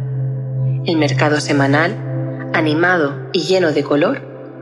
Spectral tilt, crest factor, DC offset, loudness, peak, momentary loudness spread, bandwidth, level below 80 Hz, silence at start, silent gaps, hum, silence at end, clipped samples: -6 dB/octave; 16 dB; under 0.1%; -16 LUFS; 0 dBFS; 9 LU; 11 kHz; -58 dBFS; 0 s; none; none; 0 s; under 0.1%